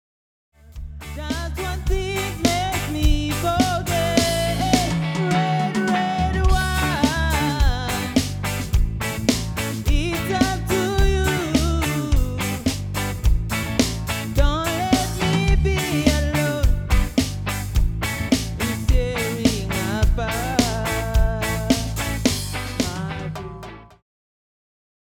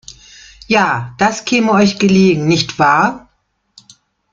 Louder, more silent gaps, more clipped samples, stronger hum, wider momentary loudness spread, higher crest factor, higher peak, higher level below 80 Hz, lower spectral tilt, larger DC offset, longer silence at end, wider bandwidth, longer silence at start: second, -22 LUFS vs -13 LUFS; neither; neither; neither; about the same, 6 LU vs 5 LU; first, 20 dB vs 14 dB; about the same, 0 dBFS vs 0 dBFS; first, -26 dBFS vs -50 dBFS; about the same, -5 dB/octave vs -5 dB/octave; neither; about the same, 1.2 s vs 1.15 s; first, 19.5 kHz vs 7.6 kHz; first, 0.65 s vs 0.1 s